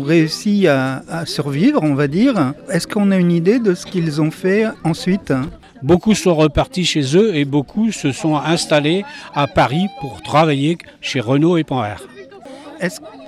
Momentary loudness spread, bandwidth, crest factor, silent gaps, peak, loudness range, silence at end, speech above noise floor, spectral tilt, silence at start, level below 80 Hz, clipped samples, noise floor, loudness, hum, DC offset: 10 LU; 13.5 kHz; 14 dB; none; -2 dBFS; 2 LU; 0 s; 20 dB; -6 dB/octave; 0 s; -44 dBFS; under 0.1%; -36 dBFS; -17 LUFS; none; under 0.1%